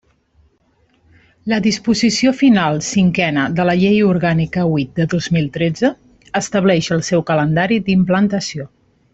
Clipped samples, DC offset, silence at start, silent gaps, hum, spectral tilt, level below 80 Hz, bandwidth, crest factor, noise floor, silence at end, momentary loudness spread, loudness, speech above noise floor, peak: under 0.1%; under 0.1%; 1.45 s; none; none; -5.5 dB/octave; -48 dBFS; 8.2 kHz; 14 dB; -58 dBFS; 0.45 s; 7 LU; -16 LUFS; 43 dB; -2 dBFS